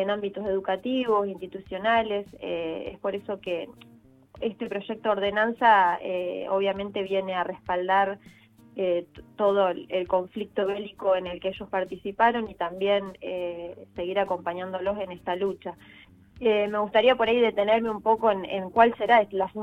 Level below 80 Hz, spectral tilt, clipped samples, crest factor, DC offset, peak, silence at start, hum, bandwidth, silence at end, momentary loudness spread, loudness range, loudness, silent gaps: -60 dBFS; -6.5 dB/octave; under 0.1%; 22 dB; under 0.1%; -4 dBFS; 0 s; none; 8.2 kHz; 0 s; 12 LU; 6 LU; -26 LUFS; none